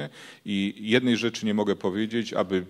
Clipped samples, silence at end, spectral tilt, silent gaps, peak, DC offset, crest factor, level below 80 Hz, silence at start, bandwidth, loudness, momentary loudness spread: under 0.1%; 0 s; -5.5 dB/octave; none; -6 dBFS; under 0.1%; 20 dB; -70 dBFS; 0 s; 13 kHz; -26 LUFS; 8 LU